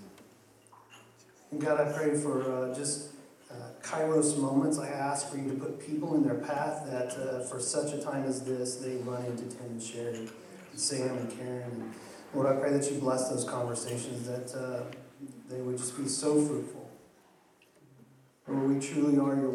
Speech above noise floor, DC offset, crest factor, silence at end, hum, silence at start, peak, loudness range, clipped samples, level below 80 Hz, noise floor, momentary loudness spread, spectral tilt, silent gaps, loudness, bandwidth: 31 dB; under 0.1%; 18 dB; 0 s; none; 0 s; -16 dBFS; 4 LU; under 0.1%; -80 dBFS; -63 dBFS; 16 LU; -5 dB/octave; none; -32 LUFS; 14.5 kHz